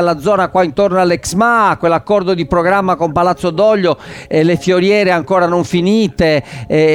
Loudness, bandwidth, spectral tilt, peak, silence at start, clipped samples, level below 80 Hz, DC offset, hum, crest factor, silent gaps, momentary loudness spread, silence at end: -13 LUFS; 16.5 kHz; -6 dB/octave; -2 dBFS; 0 s; under 0.1%; -40 dBFS; under 0.1%; none; 10 dB; none; 3 LU; 0 s